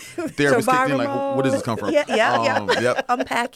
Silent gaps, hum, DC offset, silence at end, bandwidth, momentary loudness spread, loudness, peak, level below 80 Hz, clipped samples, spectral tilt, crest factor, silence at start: none; none; under 0.1%; 0.1 s; 16 kHz; 5 LU; -20 LUFS; -6 dBFS; -58 dBFS; under 0.1%; -4.5 dB/octave; 14 dB; 0 s